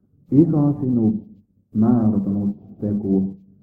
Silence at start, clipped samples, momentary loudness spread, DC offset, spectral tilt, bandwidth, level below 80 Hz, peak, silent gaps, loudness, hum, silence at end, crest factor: 0.3 s; under 0.1%; 11 LU; under 0.1%; -13 dB/octave; 1.8 kHz; -52 dBFS; -2 dBFS; none; -20 LUFS; none; 0.25 s; 18 dB